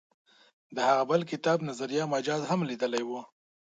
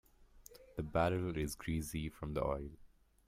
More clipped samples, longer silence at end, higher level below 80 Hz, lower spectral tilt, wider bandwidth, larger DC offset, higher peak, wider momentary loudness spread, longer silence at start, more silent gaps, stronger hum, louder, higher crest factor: neither; about the same, 0.45 s vs 0.4 s; second, -78 dBFS vs -52 dBFS; about the same, -5 dB/octave vs -6 dB/octave; second, 9.4 kHz vs 16 kHz; neither; first, -12 dBFS vs -20 dBFS; second, 9 LU vs 16 LU; first, 0.7 s vs 0.2 s; neither; neither; first, -29 LUFS vs -39 LUFS; about the same, 20 dB vs 20 dB